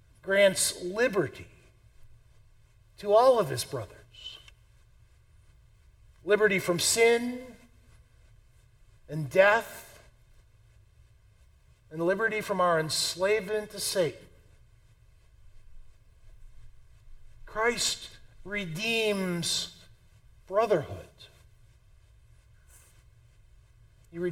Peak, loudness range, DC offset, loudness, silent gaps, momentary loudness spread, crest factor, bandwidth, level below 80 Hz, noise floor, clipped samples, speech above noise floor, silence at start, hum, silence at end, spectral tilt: -8 dBFS; 7 LU; under 0.1%; -27 LUFS; none; 21 LU; 24 dB; 17 kHz; -56 dBFS; -60 dBFS; under 0.1%; 33 dB; 0.25 s; none; 0 s; -3 dB/octave